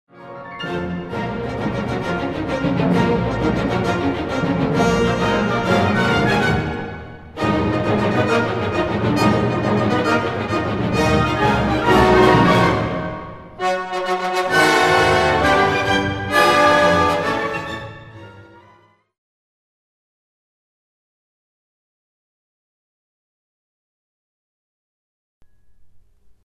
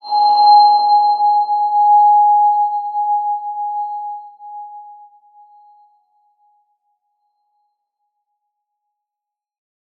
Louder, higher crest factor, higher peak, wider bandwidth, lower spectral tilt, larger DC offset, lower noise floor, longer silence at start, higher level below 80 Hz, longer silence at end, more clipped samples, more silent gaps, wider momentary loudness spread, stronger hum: second, -18 LUFS vs -13 LUFS; about the same, 18 dB vs 16 dB; about the same, 0 dBFS vs -2 dBFS; first, 13.5 kHz vs 4.6 kHz; first, -5.5 dB/octave vs -3 dB/octave; neither; second, -54 dBFS vs -85 dBFS; about the same, 0.15 s vs 0.05 s; first, -38 dBFS vs under -90 dBFS; second, 0.45 s vs 5.05 s; neither; first, 19.18-25.41 s vs none; second, 13 LU vs 23 LU; neither